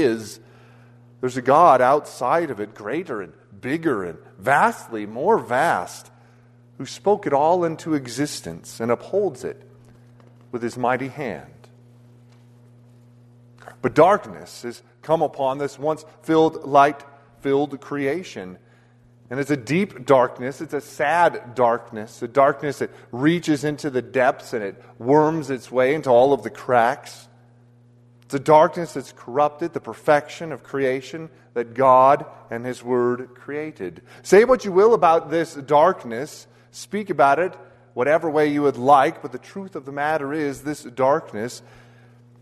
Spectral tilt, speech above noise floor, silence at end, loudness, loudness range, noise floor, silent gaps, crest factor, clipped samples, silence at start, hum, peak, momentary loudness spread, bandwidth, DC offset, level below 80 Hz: -6 dB/octave; 33 dB; 0.85 s; -21 LUFS; 7 LU; -53 dBFS; none; 20 dB; under 0.1%; 0 s; none; -2 dBFS; 18 LU; 13.5 kHz; under 0.1%; -62 dBFS